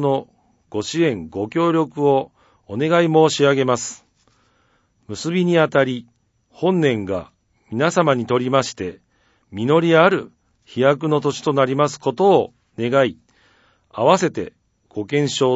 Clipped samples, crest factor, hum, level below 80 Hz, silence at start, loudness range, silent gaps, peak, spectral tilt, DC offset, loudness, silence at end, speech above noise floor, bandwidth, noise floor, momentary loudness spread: under 0.1%; 20 dB; none; -60 dBFS; 0 s; 3 LU; none; 0 dBFS; -5.5 dB/octave; under 0.1%; -18 LUFS; 0 s; 44 dB; 8 kHz; -62 dBFS; 15 LU